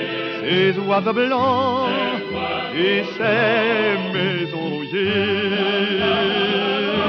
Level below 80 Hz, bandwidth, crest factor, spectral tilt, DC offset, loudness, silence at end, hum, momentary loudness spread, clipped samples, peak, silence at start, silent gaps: -58 dBFS; 6.4 kHz; 14 dB; -7 dB/octave; under 0.1%; -19 LUFS; 0 s; none; 6 LU; under 0.1%; -6 dBFS; 0 s; none